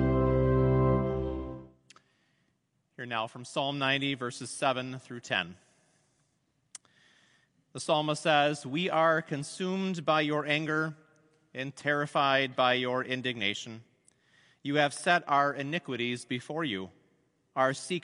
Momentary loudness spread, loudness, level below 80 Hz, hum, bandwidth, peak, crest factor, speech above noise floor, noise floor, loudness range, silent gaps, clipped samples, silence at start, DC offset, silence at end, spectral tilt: 15 LU; -30 LUFS; -48 dBFS; none; 11 kHz; -10 dBFS; 20 dB; 46 dB; -76 dBFS; 6 LU; none; under 0.1%; 0 s; under 0.1%; 0.05 s; -5 dB/octave